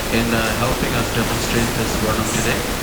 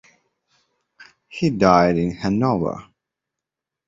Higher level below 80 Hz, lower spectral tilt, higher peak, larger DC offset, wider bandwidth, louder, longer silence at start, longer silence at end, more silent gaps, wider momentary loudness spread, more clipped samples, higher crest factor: first, -30 dBFS vs -48 dBFS; second, -4 dB/octave vs -7.5 dB/octave; about the same, -4 dBFS vs -2 dBFS; neither; first, over 20 kHz vs 7.8 kHz; about the same, -19 LUFS vs -19 LUFS; second, 0 s vs 1 s; second, 0 s vs 1.05 s; neither; second, 1 LU vs 15 LU; neither; second, 14 dB vs 20 dB